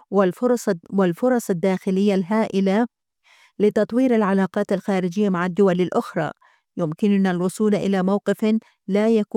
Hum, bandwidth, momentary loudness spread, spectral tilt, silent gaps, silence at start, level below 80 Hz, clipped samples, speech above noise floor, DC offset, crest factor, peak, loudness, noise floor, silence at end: none; 14.5 kHz; 5 LU; -7 dB/octave; none; 0.1 s; -68 dBFS; under 0.1%; 37 dB; under 0.1%; 14 dB; -6 dBFS; -21 LUFS; -57 dBFS; 0.15 s